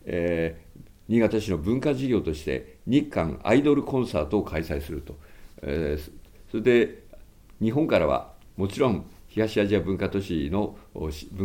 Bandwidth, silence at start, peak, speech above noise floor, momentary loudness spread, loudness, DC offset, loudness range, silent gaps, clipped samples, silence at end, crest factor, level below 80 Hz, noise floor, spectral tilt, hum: 17 kHz; 0.05 s; -6 dBFS; 23 dB; 13 LU; -26 LUFS; under 0.1%; 3 LU; none; under 0.1%; 0 s; 20 dB; -44 dBFS; -48 dBFS; -7 dB/octave; none